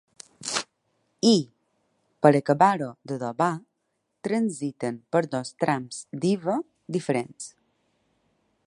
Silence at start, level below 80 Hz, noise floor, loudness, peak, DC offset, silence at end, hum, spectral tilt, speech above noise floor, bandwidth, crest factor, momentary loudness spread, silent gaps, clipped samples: 0.4 s; -74 dBFS; -77 dBFS; -25 LUFS; -2 dBFS; under 0.1%; 1.2 s; none; -5 dB/octave; 53 dB; 11.5 kHz; 24 dB; 16 LU; none; under 0.1%